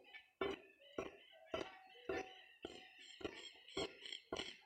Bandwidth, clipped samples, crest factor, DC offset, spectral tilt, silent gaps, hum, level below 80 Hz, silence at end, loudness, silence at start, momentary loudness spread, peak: 16 kHz; under 0.1%; 22 dB; under 0.1%; -3.5 dB/octave; none; none; -74 dBFS; 0 s; -50 LUFS; 0 s; 10 LU; -30 dBFS